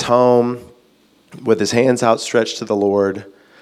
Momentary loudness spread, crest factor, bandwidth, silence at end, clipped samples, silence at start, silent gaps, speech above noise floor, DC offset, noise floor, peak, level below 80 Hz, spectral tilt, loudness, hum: 11 LU; 16 dB; 14 kHz; 0.35 s; under 0.1%; 0 s; none; 39 dB; under 0.1%; -54 dBFS; 0 dBFS; -60 dBFS; -5 dB/octave; -16 LUFS; none